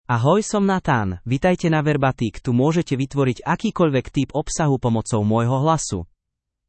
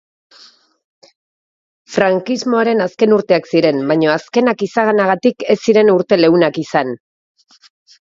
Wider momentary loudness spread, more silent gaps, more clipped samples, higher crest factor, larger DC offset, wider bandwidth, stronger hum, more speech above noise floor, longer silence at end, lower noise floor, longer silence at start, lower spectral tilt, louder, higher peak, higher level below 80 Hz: about the same, 5 LU vs 6 LU; neither; neither; about the same, 16 dB vs 16 dB; neither; first, 8.8 kHz vs 7.8 kHz; neither; first, 61 dB vs 33 dB; second, 0.65 s vs 1.25 s; first, -81 dBFS vs -46 dBFS; second, 0.1 s vs 1.9 s; about the same, -6 dB/octave vs -6 dB/octave; second, -20 LUFS vs -14 LUFS; second, -4 dBFS vs 0 dBFS; first, -44 dBFS vs -62 dBFS